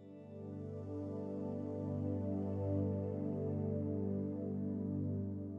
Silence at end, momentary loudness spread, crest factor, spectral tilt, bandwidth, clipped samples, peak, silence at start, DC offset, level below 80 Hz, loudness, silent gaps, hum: 0 s; 8 LU; 14 dB; -12 dB/octave; 3 kHz; under 0.1%; -26 dBFS; 0 s; under 0.1%; -80 dBFS; -40 LUFS; none; 50 Hz at -70 dBFS